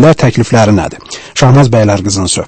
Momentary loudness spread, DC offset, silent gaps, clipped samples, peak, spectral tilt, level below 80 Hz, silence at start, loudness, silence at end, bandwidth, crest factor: 12 LU; under 0.1%; none; 1%; 0 dBFS; -5.5 dB/octave; -34 dBFS; 0 s; -9 LUFS; 0 s; 8.8 kHz; 8 dB